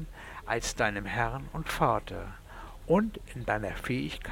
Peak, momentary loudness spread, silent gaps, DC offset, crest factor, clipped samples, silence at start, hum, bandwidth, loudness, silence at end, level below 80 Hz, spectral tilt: -10 dBFS; 16 LU; none; under 0.1%; 22 dB; under 0.1%; 0 s; none; 18.5 kHz; -31 LUFS; 0 s; -44 dBFS; -5 dB/octave